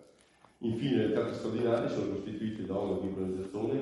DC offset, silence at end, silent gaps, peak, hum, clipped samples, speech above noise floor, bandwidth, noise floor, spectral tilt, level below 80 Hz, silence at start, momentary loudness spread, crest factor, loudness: under 0.1%; 0 s; none; -16 dBFS; none; under 0.1%; 31 dB; 11.5 kHz; -63 dBFS; -7.5 dB/octave; -66 dBFS; 0 s; 7 LU; 16 dB; -33 LUFS